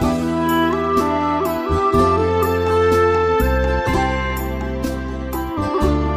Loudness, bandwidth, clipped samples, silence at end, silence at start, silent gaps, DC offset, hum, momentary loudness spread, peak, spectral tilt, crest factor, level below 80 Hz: -18 LUFS; 16 kHz; under 0.1%; 0 s; 0 s; none; under 0.1%; none; 9 LU; -4 dBFS; -6.5 dB/octave; 14 dB; -28 dBFS